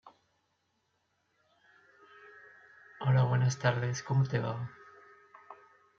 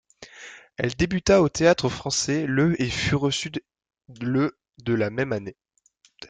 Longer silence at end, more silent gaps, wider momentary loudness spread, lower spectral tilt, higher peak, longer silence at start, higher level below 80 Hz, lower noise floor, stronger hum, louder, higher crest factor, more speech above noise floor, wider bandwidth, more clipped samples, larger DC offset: first, 0.45 s vs 0.05 s; neither; first, 26 LU vs 17 LU; first, -6.5 dB/octave vs -5 dB/octave; second, -12 dBFS vs -4 dBFS; second, 0.05 s vs 0.2 s; second, -72 dBFS vs -48 dBFS; first, -78 dBFS vs -45 dBFS; neither; second, -31 LUFS vs -23 LUFS; about the same, 22 dB vs 20 dB; first, 49 dB vs 22 dB; second, 7.6 kHz vs 9.6 kHz; neither; neither